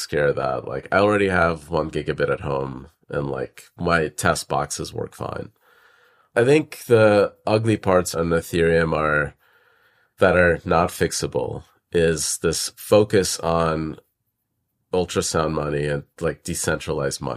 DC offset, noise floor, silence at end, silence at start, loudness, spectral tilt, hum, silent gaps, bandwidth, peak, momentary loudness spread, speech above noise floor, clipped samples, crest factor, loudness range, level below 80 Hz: under 0.1%; -75 dBFS; 0 s; 0 s; -21 LUFS; -4.5 dB/octave; none; none; 15.5 kHz; -4 dBFS; 13 LU; 54 dB; under 0.1%; 18 dB; 6 LU; -44 dBFS